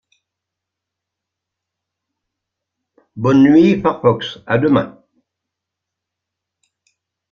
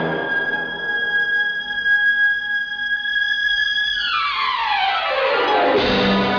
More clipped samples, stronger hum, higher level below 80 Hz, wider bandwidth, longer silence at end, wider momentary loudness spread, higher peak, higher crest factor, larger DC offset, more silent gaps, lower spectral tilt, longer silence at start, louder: neither; neither; second, -54 dBFS vs -48 dBFS; first, 7 kHz vs 5.4 kHz; first, 2.4 s vs 0 s; first, 11 LU vs 5 LU; first, -2 dBFS vs -6 dBFS; first, 18 dB vs 12 dB; neither; neither; first, -8 dB/octave vs -4.5 dB/octave; first, 3.15 s vs 0 s; first, -14 LUFS vs -18 LUFS